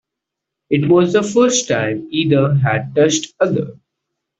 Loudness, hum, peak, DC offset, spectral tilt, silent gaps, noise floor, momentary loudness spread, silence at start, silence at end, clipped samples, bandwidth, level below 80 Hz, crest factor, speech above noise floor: -16 LUFS; none; -2 dBFS; under 0.1%; -5 dB/octave; none; -81 dBFS; 7 LU; 0.7 s; 0.7 s; under 0.1%; 8.2 kHz; -56 dBFS; 14 dB; 66 dB